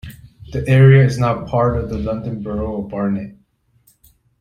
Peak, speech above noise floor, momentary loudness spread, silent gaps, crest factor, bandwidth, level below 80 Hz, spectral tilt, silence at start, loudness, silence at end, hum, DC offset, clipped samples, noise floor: -2 dBFS; 42 dB; 16 LU; none; 16 dB; 9.8 kHz; -38 dBFS; -8.5 dB/octave; 0.05 s; -17 LUFS; 1.1 s; none; under 0.1%; under 0.1%; -57 dBFS